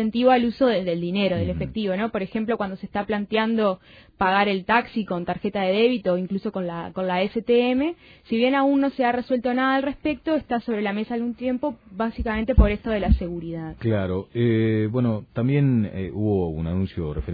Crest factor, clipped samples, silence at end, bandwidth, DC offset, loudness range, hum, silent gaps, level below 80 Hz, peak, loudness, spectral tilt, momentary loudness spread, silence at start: 18 dB; under 0.1%; 0 s; 5 kHz; under 0.1%; 2 LU; none; none; -34 dBFS; -6 dBFS; -23 LUFS; -10 dB/octave; 8 LU; 0 s